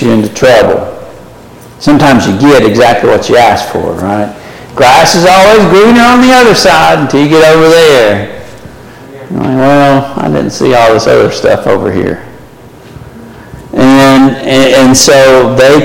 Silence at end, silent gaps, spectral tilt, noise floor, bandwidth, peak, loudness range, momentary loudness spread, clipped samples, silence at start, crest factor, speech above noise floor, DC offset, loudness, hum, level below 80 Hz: 0 s; none; -4.5 dB/octave; -31 dBFS; 17.5 kHz; 0 dBFS; 6 LU; 11 LU; 0.4%; 0 s; 6 dB; 27 dB; under 0.1%; -5 LUFS; none; -34 dBFS